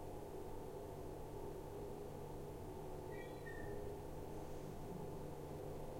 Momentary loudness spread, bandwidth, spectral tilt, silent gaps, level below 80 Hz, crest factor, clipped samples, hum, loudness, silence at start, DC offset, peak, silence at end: 2 LU; 16.5 kHz; -6.5 dB/octave; none; -56 dBFS; 12 dB; under 0.1%; none; -51 LUFS; 0 s; under 0.1%; -36 dBFS; 0 s